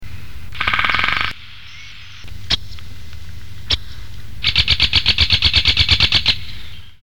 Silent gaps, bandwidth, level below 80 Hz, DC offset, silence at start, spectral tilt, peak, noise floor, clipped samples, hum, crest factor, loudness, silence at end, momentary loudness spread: none; 19.5 kHz; -30 dBFS; 5%; 0 s; -2.5 dB/octave; 0 dBFS; -38 dBFS; under 0.1%; none; 18 dB; -15 LUFS; 0 s; 24 LU